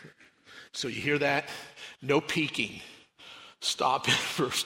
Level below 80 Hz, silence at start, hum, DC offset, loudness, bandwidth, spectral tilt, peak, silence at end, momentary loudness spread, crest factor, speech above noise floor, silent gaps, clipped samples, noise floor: -68 dBFS; 0 s; none; under 0.1%; -29 LUFS; 16 kHz; -3 dB/octave; -12 dBFS; 0 s; 20 LU; 20 dB; 26 dB; none; under 0.1%; -55 dBFS